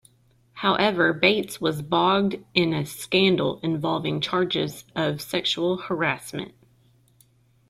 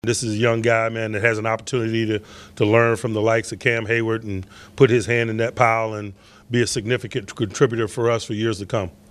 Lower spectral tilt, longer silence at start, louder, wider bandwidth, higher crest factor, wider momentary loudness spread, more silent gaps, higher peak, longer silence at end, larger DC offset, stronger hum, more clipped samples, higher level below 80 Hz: about the same, -5 dB/octave vs -5.5 dB/octave; first, 0.55 s vs 0.05 s; about the same, -23 LUFS vs -21 LUFS; first, 15.5 kHz vs 13 kHz; about the same, 20 dB vs 20 dB; about the same, 8 LU vs 10 LU; neither; second, -4 dBFS vs 0 dBFS; first, 1.2 s vs 0.2 s; neither; neither; neither; second, -60 dBFS vs -54 dBFS